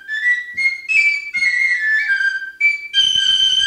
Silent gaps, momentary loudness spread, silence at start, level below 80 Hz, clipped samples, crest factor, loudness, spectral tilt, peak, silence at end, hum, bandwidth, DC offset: none; 5 LU; 0.05 s; -58 dBFS; under 0.1%; 12 dB; -14 LUFS; 3 dB/octave; -4 dBFS; 0 s; none; 16 kHz; under 0.1%